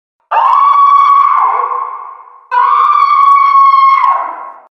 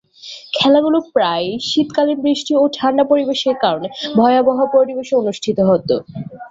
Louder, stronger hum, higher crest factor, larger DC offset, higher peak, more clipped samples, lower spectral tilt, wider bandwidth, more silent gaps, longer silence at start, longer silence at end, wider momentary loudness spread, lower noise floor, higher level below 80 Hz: first, -8 LUFS vs -16 LUFS; neither; about the same, 10 dB vs 14 dB; neither; about the same, 0 dBFS vs -2 dBFS; neither; second, -0.5 dB/octave vs -5.5 dB/octave; second, 6 kHz vs 7.8 kHz; neither; about the same, 0.3 s vs 0.25 s; first, 0.25 s vs 0.05 s; first, 13 LU vs 8 LU; second, -31 dBFS vs -37 dBFS; second, -68 dBFS vs -56 dBFS